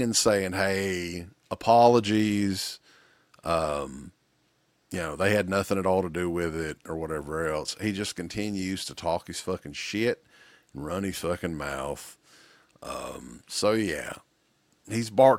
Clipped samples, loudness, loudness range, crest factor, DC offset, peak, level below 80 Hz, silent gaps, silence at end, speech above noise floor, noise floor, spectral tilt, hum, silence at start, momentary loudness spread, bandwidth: under 0.1%; -28 LUFS; 7 LU; 22 dB; under 0.1%; -6 dBFS; -54 dBFS; none; 0 s; 42 dB; -69 dBFS; -4.5 dB/octave; none; 0 s; 16 LU; 16.5 kHz